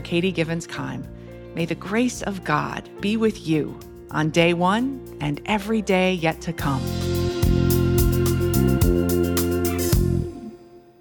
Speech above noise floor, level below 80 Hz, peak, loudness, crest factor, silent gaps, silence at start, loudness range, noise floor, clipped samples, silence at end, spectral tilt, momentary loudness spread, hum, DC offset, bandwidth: 23 dB; -34 dBFS; -4 dBFS; -22 LUFS; 18 dB; none; 0 s; 5 LU; -46 dBFS; under 0.1%; 0.2 s; -6 dB/octave; 11 LU; none; under 0.1%; 19 kHz